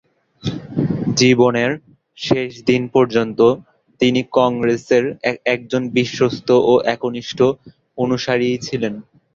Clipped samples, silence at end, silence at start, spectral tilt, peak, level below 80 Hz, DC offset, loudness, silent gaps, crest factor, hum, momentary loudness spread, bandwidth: under 0.1%; 0.35 s; 0.45 s; -5.5 dB/octave; -2 dBFS; -52 dBFS; under 0.1%; -17 LUFS; none; 16 dB; none; 12 LU; 7.6 kHz